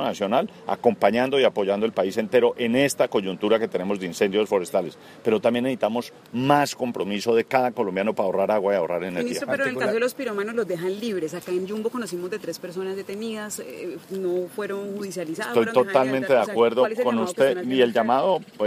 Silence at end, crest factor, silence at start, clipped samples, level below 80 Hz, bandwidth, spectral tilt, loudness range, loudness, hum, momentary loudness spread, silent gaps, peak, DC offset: 0 s; 20 dB; 0 s; under 0.1%; -70 dBFS; 15.5 kHz; -5 dB/octave; 8 LU; -24 LUFS; none; 10 LU; none; -4 dBFS; under 0.1%